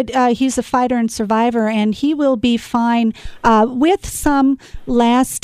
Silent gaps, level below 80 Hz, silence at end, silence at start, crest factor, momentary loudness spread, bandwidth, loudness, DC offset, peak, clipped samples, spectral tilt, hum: none; -38 dBFS; 0.05 s; 0 s; 14 dB; 4 LU; 14.5 kHz; -16 LUFS; under 0.1%; -2 dBFS; under 0.1%; -4.5 dB/octave; none